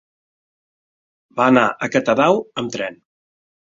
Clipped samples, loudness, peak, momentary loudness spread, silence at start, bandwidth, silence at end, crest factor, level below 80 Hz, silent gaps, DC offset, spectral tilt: under 0.1%; -17 LUFS; -2 dBFS; 13 LU; 1.35 s; 7.6 kHz; 0.85 s; 20 dB; -60 dBFS; none; under 0.1%; -5.5 dB/octave